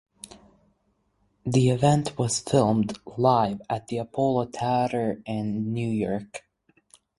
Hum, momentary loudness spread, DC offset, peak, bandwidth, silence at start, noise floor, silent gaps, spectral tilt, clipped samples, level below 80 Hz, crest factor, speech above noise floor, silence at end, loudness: none; 13 LU; under 0.1%; -6 dBFS; 11.5 kHz; 1.45 s; -70 dBFS; none; -6 dB/octave; under 0.1%; -56 dBFS; 20 dB; 46 dB; 0.8 s; -25 LUFS